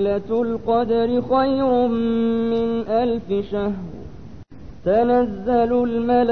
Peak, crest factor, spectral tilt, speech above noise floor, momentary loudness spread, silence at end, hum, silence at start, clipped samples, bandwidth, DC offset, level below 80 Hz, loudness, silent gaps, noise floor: -6 dBFS; 14 dB; -9 dB/octave; 20 dB; 7 LU; 0 s; none; 0 s; under 0.1%; 6 kHz; 0.9%; -44 dBFS; -20 LUFS; none; -39 dBFS